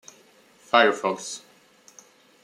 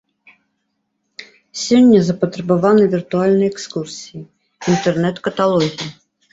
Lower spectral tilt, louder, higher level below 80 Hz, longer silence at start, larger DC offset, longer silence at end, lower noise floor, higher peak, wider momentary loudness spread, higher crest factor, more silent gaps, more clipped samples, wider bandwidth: second, -2.5 dB/octave vs -6 dB/octave; second, -22 LUFS vs -16 LUFS; second, -80 dBFS vs -56 dBFS; second, 0.75 s vs 1.2 s; neither; first, 1.05 s vs 0.4 s; second, -56 dBFS vs -71 dBFS; about the same, -2 dBFS vs -2 dBFS; second, 17 LU vs 20 LU; first, 24 dB vs 16 dB; neither; neither; first, 14.5 kHz vs 8 kHz